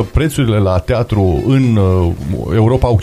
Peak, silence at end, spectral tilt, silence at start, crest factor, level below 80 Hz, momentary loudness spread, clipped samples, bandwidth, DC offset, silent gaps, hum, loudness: 0 dBFS; 0 s; -7.5 dB/octave; 0 s; 12 dB; -26 dBFS; 4 LU; under 0.1%; 13.5 kHz; under 0.1%; none; none; -13 LUFS